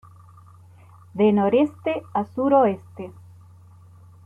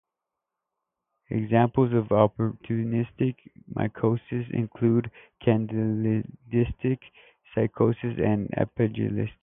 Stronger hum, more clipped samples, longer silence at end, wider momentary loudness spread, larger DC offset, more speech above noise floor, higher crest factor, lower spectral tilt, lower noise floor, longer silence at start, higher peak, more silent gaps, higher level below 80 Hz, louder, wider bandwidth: neither; neither; first, 1.15 s vs 0.1 s; first, 20 LU vs 8 LU; neither; second, 28 dB vs 61 dB; about the same, 18 dB vs 22 dB; second, -9 dB/octave vs -12.5 dB/octave; second, -48 dBFS vs -86 dBFS; second, 1.15 s vs 1.3 s; about the same, -6 dBFS vs -4 dBFS; neither; second, -66 dBFS vs -52 dBFS; first, -21 LUFS vs -26 LUFS; about the same, 3.8 kHz vs 3.7 kHz